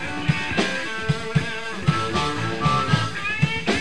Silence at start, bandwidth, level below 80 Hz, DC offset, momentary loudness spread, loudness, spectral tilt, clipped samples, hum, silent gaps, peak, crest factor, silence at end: 0 s; 11.5 kHz; -44 dBFS; 2%; 4 LU; -23 LUFS; -5 dB/octave; under 0.1%; none; none; -6 dBFS; 18 dB; 0 s